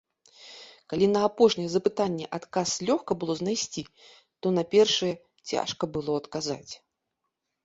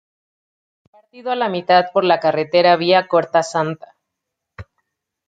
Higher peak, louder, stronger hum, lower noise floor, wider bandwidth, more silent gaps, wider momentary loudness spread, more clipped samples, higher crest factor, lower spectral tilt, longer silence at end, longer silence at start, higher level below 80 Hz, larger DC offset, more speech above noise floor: second, -8 dBFS vs -2 dBFS; second, -27 LUFS vs -16 LUFS; neither; about the same, -82 dBFS vs -80 dBFS; second, 8 kHz vs 9.2 kHz; neither; first, 20 LU vs 11 LU; neither; about the same, 20 dB vs 18 dB; about the same, -4.5 dB/octave vs -5 dB/octave; first, 0.9 s vs 0.65 s; second, 0.4 s vs 1.15 s; about the same, -64 dBFS vs -60 dBFS; neither; second, 56 dB vs 64 dB